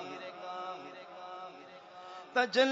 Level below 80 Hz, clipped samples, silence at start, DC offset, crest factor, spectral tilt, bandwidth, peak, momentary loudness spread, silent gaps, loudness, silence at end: -88 dBFS; under 0.1%; 0 s; under 0.1%; 22 dB; 0 dB/octave; 7.4 kHz; -14 dBFS; 19 LU; none; -36 LUFS; 0 s